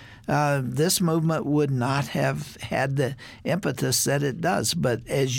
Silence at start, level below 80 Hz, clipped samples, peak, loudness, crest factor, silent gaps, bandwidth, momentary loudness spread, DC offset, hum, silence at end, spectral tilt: 0 s; -54 dBFS; under 0.1%; -10 dBFS; -24 LUFS; 14 dB; none; 17 kHz; 6 LU; under 0.1%; none; 0 s; -4.5 dB/octave